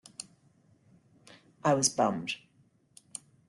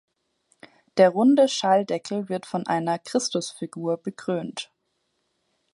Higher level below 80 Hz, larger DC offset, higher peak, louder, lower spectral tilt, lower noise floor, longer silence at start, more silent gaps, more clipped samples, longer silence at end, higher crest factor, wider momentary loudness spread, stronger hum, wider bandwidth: about the same, -74 dBFS vs -76 dBFS; neither; second, -12 dBFS vs -4 dBFS; second, -29 LUFS vs -24 LUFS; second, -3.5 dB/octave vs -5 dB/octave; second, -67 dBFS vs -74 dBFS; second, 0.2 s vs 0.95 s; neither; neither; about the same, 1.1 s vs 1.1 s; about the same, 22 dB vs 20 dB; first, 20 LU vs 13 LU; neither; about the same, 12 kHz vs 11.5 kHz